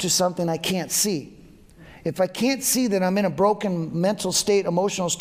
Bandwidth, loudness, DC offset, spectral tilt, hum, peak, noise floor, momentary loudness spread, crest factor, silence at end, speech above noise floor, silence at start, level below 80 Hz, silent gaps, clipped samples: 16 kHz; -22 LUFS; under 0.1%; -3.5 dB/octave; none; -8 dBFS; -48 dBFS; 5 LU; 14 dB; 0 s; 25 dB; 0 s; -56 dBFS; none; under 0.1%